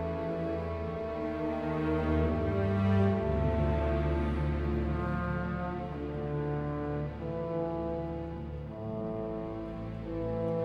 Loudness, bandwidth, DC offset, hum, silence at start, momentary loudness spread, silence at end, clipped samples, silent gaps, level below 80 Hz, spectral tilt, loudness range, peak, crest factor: -33 LUFS; 6 kHz; under 0.1%; none; 0 s; 9 LU; 0 s; under 0.1%; none; -40 dBFS; -9.5 dB/octave; 6 LU; -16 dBFS; 16 dB